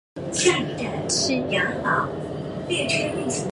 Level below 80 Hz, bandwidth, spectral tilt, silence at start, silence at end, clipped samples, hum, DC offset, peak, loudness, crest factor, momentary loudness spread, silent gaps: -50 dBFS; 11.5 kHz; -3.5 dB/octave; 0.15 s; 0 s; under 0.1%; none; under 0.1%; -4 dBFS; -23 LUFS; 20 dB; 8 LU; none